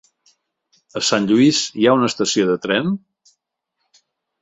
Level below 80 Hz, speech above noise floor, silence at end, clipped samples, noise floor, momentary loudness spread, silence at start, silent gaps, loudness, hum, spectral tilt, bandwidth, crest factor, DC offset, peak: -62 dBFS; 59 dB; 1.45 s; under 0.1%; -76 dBFS; 9 LU; 0.95 s; none; -17 LUFS; none; -4 dB/octave; 8.2 kHz; 18 dB; under 0.1%; -2 dBFS